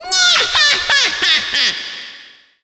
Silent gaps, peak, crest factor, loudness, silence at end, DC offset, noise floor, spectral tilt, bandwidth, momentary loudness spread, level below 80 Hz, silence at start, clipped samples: none; -2 dBFS; 14 dB; -12 LUFS; 0.4 s; under 0.1%; -42 dBFS; 1.5 dB/octave; 9.2 kHz; 16 LU; -50 dBFS; 0 s; under 0.1%